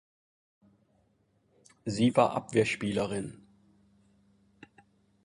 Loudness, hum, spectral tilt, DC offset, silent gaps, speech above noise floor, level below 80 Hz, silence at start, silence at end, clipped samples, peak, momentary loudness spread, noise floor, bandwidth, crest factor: -29 LUFS; none; -5.5 dB/octave; under 0.1%; none; 43 dB; -64 dBFS; 1.85 s; 1.9 s; under 0.1%; -10 dBFS; 14 LU; -71 dBFS; 11.5 kHz; 24 dB